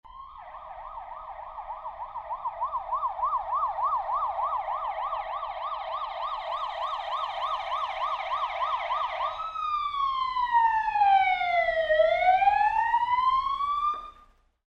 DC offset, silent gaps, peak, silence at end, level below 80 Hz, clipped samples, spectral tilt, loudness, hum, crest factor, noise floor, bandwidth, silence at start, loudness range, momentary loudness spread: under 0.1%; none; -12 dBFS; 0.6 s; -56 dBFS; under 0.1%; -2.5 dB/octave; -27 LUFS; none; 16 dB; -58 dBFS; 8 kHz; 0.05 s; 8 LU; 18 LU